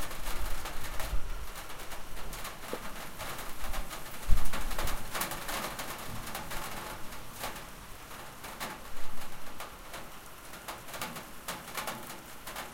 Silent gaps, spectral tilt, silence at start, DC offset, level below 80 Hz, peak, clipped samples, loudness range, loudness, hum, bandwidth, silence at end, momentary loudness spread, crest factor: none; -3 dB/octave; 0 s; under 0.1%; -40 dBFS; -8 dBFS; under 0.1%; 6 LU; -40 LUFS; none; 17 kHz; 0 s; 9 LU; 22 dB